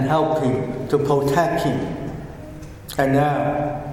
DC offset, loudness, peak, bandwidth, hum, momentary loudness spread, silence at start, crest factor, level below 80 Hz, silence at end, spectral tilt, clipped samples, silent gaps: under 0.1%; -21 LUFS; -4 dBFS; 17 kHz; none; 17 LU; 0 s; 16 dB; -42 dBFS; 0 s; -7 dB/octave; under 0.1%; none